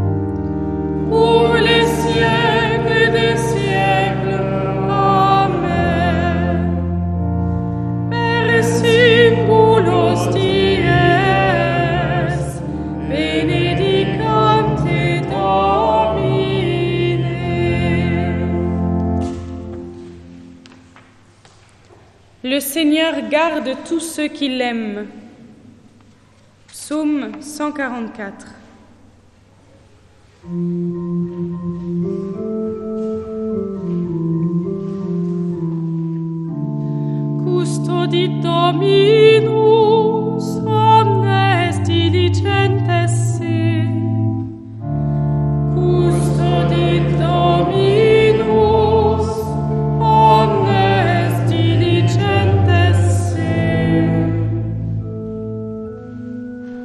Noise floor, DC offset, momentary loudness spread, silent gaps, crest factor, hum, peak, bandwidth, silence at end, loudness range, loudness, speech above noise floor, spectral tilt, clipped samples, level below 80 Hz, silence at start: -49 dBFS; under 0.1%; 12 LU; none; 16 dB; none; 0 dBFS; 13 kHz; 0 s; 12 LU; -16 LUFS; 27 dB; -6.5 dB/octave; under 0.1%; -36 dBFS; 0 s